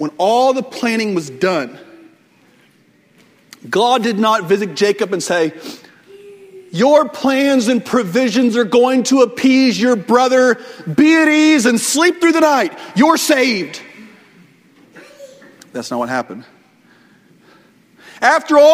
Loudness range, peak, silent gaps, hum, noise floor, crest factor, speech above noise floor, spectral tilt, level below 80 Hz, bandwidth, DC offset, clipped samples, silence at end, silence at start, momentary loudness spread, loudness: 15 LU; 0 dBFS; none; none; -53 dBFS; 16 dB; 39 dB; -4 dB/octave; -62 dBFS; 16 kHz; under 0.1%; under 0.1%; 0 s; 0 s; 11 LU; -14 LUFS